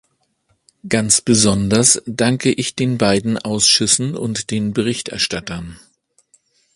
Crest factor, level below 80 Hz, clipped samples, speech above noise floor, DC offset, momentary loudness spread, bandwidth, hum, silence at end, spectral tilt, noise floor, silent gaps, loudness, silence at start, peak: 18 dB; -46 dBFS; under 0.1%; 47 dB; under 0.1%; 9 LU; 11.5 kHz; none; 1 s; -3.5 dB/octave; -64 dBFS; none; -16 LUFS; 0.85 s; 0 dBFS